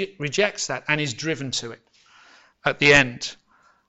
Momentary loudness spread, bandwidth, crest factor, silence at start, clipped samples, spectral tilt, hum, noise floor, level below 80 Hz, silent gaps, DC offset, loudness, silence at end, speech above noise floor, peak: 15 LU; 8.4 kHz; 24 dB; 0 s; under 0.1%; -3.5 dB/octave; none; -53 dBFS; -50 dBFS; none; under 0.1%; -21 LUFS; 0.55 s; 31 dB; 0 dBFS